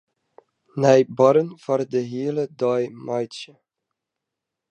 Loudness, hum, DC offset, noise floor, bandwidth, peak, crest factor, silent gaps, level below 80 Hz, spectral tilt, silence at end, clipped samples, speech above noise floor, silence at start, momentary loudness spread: -21 LUFS; none; under 0.1%; -84 dBFS; 9.4 kHz; -2 dBFS; 20 dB; none; -74 dBFS; -6.5 dB/octave; 1.25 s; under 0.1%; 63 dB; 0.75 s; 16 LU